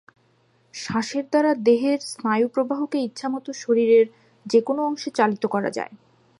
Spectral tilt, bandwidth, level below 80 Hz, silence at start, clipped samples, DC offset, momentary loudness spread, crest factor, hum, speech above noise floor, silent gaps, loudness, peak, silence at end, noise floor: -5 dB/octave; 11.5 kHz; -70 dBFS; 0.75 s; under 0.1%; under 0.1%; 11 LU; 18 dB; none; 40 dB; none; -22 LUFS; -4 dBFS; 0.45 s; -62 dBFS